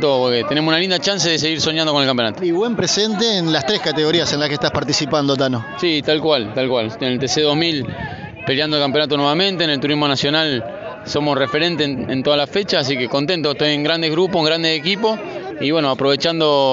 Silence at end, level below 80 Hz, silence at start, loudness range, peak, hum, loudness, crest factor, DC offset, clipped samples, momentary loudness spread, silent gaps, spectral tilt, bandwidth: 0 s; -52 dBFS; 0 s; 2 LU; -4 dBFS; none; -17 LUFS; 14 dB; under 0.1%; under 0.1%; 5 LU; none; -3 dB/octave; 8 kHz